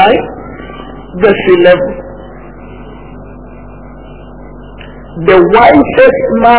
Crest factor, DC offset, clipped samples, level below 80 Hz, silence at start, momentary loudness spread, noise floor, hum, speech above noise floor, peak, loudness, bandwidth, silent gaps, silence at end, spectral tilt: 10 dB; 1%; 3%; -32 dBFS; 0 s; 25 LU; -29 dBFS; none; 23 dB; 0 dBFS; -7 LUFS; 4 kHz; none; 0 s; -9.5 dB/octave